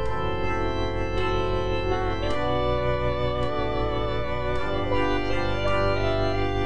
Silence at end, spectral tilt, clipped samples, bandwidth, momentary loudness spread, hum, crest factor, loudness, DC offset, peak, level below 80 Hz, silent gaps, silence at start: 0 s; -7 dB/octave; under 0.1%; 9.8 kHz; 3 LU; none; 14 dB; -26 LUFS; 3%; -12 dBFS; -34 dBFS; none; 0 s